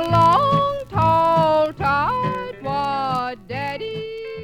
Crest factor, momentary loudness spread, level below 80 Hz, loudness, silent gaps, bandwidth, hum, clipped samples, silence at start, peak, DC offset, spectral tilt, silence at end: 16 dB; 13 LU; -44 dBFS; -20 LUFS; none; 17.5 kHz; none; under 0.1%; 0 s; -4 dBFS; 0.2%; -7 dB/octave; 0 s